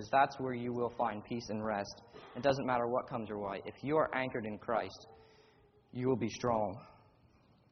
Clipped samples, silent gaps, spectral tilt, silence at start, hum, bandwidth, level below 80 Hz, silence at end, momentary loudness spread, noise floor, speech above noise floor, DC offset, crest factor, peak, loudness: under 0.1%; none; -5 dB/octave; 0 s; none; 6.4 kHz; -68 dBFS; 0.8 s; 13 LU; -66 dBFS; 31 dB; under 0.1%; 22 dB; -16 dBFS; -36 LUFS